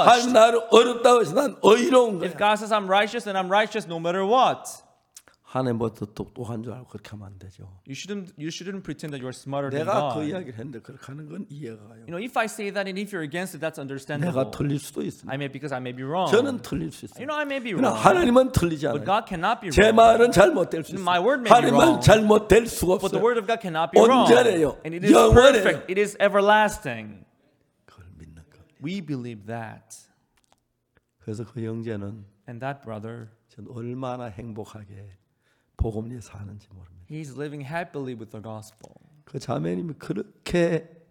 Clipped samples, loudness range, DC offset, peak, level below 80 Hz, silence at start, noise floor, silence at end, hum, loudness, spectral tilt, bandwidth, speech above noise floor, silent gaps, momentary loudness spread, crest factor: under 0.1%; 19 LU; under 0.1%; 0 dBFS; -44 dBFS; 0 s; -69 dBFS; 0.25 s; none; -21 LUFS; -5 dB/octave; 18.5 kHz; 47 dB; none; 22 LU; 22 dB